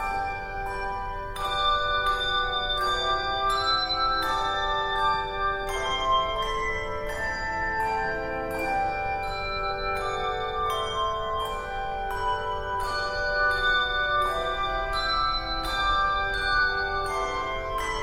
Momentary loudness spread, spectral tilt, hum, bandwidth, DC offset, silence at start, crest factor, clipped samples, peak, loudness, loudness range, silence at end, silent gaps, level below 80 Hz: 7 LU; -3 dB/octave; none; 16 kHz; under 0.1%; 0 s; 14 dB; under 0.1%; -12 dBFS; -26 LUFS; 4 LU; 0 s; none; -40 dBFS